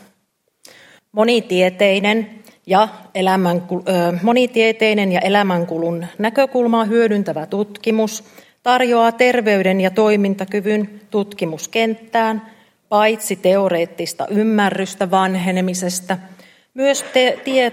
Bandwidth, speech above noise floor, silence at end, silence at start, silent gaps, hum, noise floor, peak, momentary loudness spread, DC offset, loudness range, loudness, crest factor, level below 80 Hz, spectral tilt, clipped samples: 16 kHz; 50 dB; 0 s; 1.15 s; none; none; -67 dBFS; 0 dBFS; 8 LU; under 0.1%; 3 LU; -17 LUFS; 16 dB; -68 dBFS; -5 dB/octave; under 0.1%